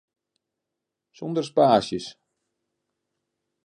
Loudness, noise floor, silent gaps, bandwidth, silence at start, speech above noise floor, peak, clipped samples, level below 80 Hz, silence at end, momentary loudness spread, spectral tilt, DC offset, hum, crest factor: -23 LUFS; -85 dBFS; none; 10 kHz; 1.2 s; 63 dB; -4 dBFS; under 0.1%; -66 dBFS; 1.55 s; 18 LU; -6 dB/octave; under 0.1%; none; 24 dB